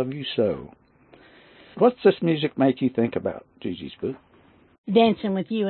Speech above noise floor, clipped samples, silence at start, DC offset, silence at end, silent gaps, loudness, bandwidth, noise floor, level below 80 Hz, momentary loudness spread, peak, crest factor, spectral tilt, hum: 33 dB; under 0.1%; 0 s; under 0.1%; 0 s; 4.78-4.84 s; -23 LUFS; 4.4 kHz; -56 dBFS; -62 dBFS; 15 LU; -6 dBFS; 20 dB; -11 dB/octave; none